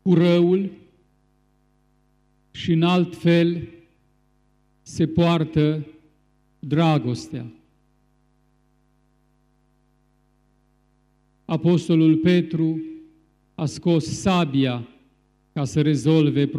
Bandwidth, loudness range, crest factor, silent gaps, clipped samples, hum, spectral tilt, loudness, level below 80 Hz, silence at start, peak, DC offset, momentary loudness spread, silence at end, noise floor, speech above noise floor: 10.5 kHz; 6 LU; 16 dB; none; under 0.1%; 50 Hz at -55 dBFS; -7 dB/octave; -21 LUFS; -56 dBFS; 0.05 s; -6 dBFS; under 0.1%; 19 LU; 0 s; -63 dBFS; 44 dB